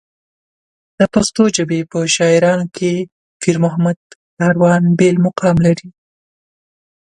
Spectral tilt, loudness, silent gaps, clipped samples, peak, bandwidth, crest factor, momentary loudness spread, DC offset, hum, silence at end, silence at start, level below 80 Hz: -5.5 dB/octave; -14 LUFS; 3.12-3.40 s, 3.96-4.37 s; under 0.1%; 0 dBFS; 11 kHz; 16 dB; 7 LU; under 0.1%; none; 1.1 s; 1 s; -48 dBFS